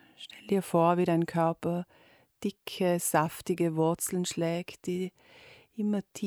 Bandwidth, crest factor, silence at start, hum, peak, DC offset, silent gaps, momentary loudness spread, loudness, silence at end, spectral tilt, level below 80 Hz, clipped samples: over 20 kHz; 18 dB; 0.2 s; none; -12 dBFS; under 0.1%; none; 12 LU; -30 LUFS; 0 s; -5.5 dB/octave; -68 dBFS; under 0.1%